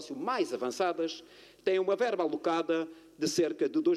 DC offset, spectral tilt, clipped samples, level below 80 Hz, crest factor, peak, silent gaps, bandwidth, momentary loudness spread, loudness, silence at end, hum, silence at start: under 0.1%; -4 dB/octave; under 0.1%; -76 dBFS; 16 dB; -14 dBFS; none; 13.5 kHz; 6 LU; -31 LUFS; 0 s; none; 0 s